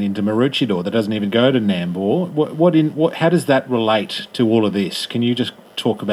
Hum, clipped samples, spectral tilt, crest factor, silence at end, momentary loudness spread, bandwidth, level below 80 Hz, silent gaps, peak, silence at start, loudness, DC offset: none; under 0.1%; -6.5 dB/octave; 16 dB; 0 s; 6 LU; 14.5 kHz; -66 dBFS; none; -2 dBFS; 0 s; -18 LUFS; under 0.1%